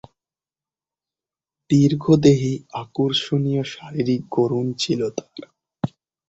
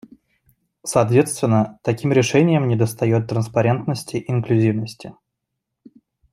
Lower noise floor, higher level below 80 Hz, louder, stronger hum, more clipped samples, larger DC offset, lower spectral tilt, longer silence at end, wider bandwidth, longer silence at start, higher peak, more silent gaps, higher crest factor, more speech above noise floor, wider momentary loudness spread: first, under -90 dBFS vs -79 dBFS; about the same, -56 dBFS vs -58 dBFS; about the same, -21 LUFS vs -19 LUFS; neither; neither; neither; about the same, -6.5 dB/octave vs -6.5 dB/octave; second, 0.4 s vs 1.2 s; second, 8.2 kHz vs 15 kHz; first, 1.7 s vs 0.85 s; about the same, -2 dBFS vs -2 dBFS; neither; about the same, 20 dB vs 18 dB; first, over 70 dB vs 61 dB; first, 14 LU vs 10 LU